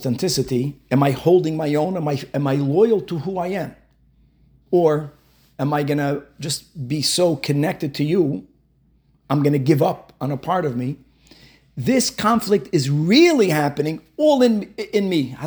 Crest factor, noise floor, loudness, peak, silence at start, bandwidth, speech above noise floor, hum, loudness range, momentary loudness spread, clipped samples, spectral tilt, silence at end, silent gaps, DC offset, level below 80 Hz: 18 dB; -59 dBFS; -20 LUFS; -2 dBFS; 0 s; over 20 kHz; 40 dB; none; 5 LU; 11 LU; under 0.1%; -5.5 dB/octave; 0 s; none; under 0.1%; -56 dBFS